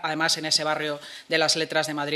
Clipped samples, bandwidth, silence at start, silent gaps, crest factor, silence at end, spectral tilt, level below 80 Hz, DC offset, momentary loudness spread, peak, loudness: under 0.1%; 14 kHz; 0 s; none; 20 dB; 0 s; -2 dB/octave; -76 dBFS; under 0.1%; 8 LU; -6 dBFS; -23 LUFS